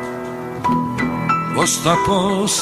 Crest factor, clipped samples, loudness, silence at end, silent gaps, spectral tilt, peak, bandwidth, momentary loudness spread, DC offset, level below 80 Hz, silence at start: 18 dB; under 0.1%; -18 LUFS; 0 s; none; -4 dB/octave; 0 dBFS; 15 kHz; 10 LU; under 0.1%; -44 dBFS; 0 s